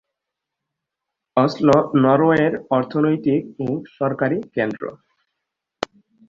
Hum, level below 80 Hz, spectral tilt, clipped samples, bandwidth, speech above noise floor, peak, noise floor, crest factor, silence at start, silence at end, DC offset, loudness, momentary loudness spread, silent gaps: none; -58 dBFS; -8 dB/octave; under 0.1%; 7.6 kHz; 64 dB; -2 dBFS; -83 dBFS; 20 dB; 1.35 s; 1.35 s; under 0.1%; -19 LUFS; 16 LU; none